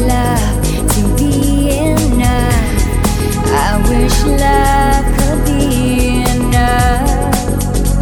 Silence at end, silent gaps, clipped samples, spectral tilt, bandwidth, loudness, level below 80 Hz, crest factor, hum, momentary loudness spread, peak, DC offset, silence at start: 0 s; none; under 0.1%; -5.5 dB/octave; 19 kHz; -13 LUFS; -16 dBFS; 12 dB; none; 4 LU; 0 dBFS; under 0.1%; 0 s